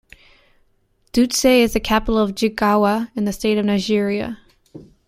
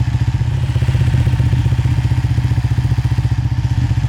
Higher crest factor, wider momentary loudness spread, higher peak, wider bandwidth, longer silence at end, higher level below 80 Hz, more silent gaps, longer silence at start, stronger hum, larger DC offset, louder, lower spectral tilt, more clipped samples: first, 18 dB vs 8 dB; first, 9 LU vs 2 LU; first, -2 dBFS vs -6 dBFS; first, 16 kHz vs 10.5 kHz; first, 0.25 s vs 0 s; second, -38 dBFS vs -22 dBFS; neither; first, 1.15 s vs 0 s; neither; neither; about the same, -18 LUFS vs -16 LUFS; second, -4.5 dB/octave vs -7.5 dB/octave; neither